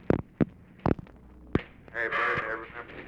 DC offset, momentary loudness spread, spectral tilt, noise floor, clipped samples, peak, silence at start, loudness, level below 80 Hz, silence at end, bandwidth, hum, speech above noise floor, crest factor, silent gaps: under 0.1%; 9 LU; -8 dB/octave; -50 dBFS; under 0.1%; -10 dBFS; 0 s; -31 LUFS; -48 dBFS; 0 s; 8 kHz; none; 19 dB; 22 dB; none